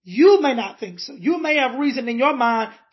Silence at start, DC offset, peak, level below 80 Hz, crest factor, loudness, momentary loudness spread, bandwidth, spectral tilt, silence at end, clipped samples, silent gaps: 0.05 s; under 0.1%; -4 dBFS; -82 dBFS; 16 dB; -19 LUFS; 14 LU; 6.2 kHz; -5 dB/octave; 0.2 s; under 0.1%; none